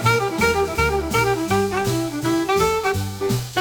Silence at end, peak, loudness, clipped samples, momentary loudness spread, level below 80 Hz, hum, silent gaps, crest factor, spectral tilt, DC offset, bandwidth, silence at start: 0 s; -4 dBFS; -20 LUFS; under 0.1%; 5 LU; -38 dBFS; none; none; 16 dB; -5 dB/octave; under 0.1%; 19.5 kHz; 0 s